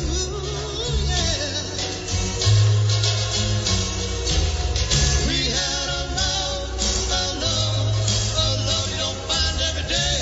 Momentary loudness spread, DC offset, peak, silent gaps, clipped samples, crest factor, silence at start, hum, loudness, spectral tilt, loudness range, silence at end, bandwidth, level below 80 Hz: 6 LU; under 0.1%; -6 dBFS; none; under 0.1%; 16 dB; 0 s; none; -21 LUFS; -3 dB/octave; 1 LU; 0 s; 8 kHz; -28 dBFS